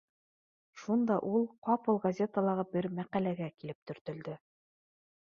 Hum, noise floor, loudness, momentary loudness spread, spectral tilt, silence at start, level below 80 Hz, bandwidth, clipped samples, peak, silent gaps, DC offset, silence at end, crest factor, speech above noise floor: none; under -90 dBFS; -33 LUFS; 14 LU; -8.5 dB/octave; 0.75 s; -76 dBFS; 7 kHz; under 0.1%; -16 dBFS; 1.58-1.62 s, 3.75-3.86 s, 4.01-4.05 s; under 0.1%; 0.85 s; 18 dB; over 57 dB